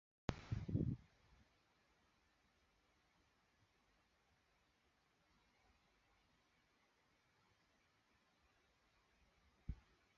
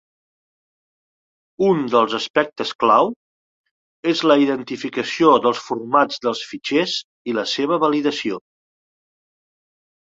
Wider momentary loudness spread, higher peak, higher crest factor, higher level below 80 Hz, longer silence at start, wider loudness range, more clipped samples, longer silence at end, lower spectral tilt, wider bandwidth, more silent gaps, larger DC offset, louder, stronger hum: first, 15 LU vs 10 LU; second, -22 dBFS vs -2 dBFS; first, 34 dB vs 20 dB; about the same, -64 dBFS vs -66 dBFS; second, 0.3 s vs 1.6 s; first, 14 LU vs 4 LU; neither; second, 0.45 s vs 1.7 s; first, -7.5 dB/octave vs -4.5 dB/octave; second, 7 kHz vs 7.8 kHz; second, none vs 2.30-2.34 s, 2.75-2.79 s, 3.16-3.64 s, 3.71-4.03 s, 7.04-7.25 s; neither; second, -48 LUFS vs -19 LUFS; neither